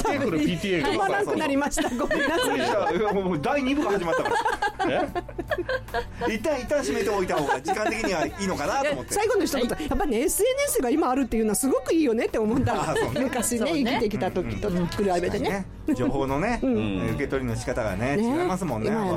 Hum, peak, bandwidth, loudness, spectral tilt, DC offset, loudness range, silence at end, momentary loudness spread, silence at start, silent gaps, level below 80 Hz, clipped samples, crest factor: none; -12 dBFS; 16 kHz; -25 LUFS; -4.5 dB/octave; under 0.1%; 3 LU; 0 s; 5 LU; 0 s; none; -42 dBFS; under 0.1%; 12 dB